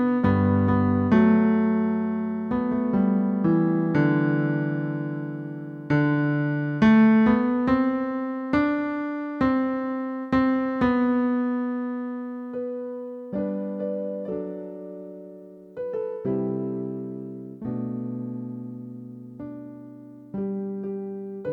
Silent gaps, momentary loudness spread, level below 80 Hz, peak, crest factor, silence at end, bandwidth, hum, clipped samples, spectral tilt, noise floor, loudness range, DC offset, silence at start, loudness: none; 18 LU; -54 dBFS; -8 dBFS; 16 dB; 0 s; 5.2 kHz; none; under 0.1%; -10 dB/octave; -44 dBFS; 12 LU; under 0.1%; 0 s; -24 LUFS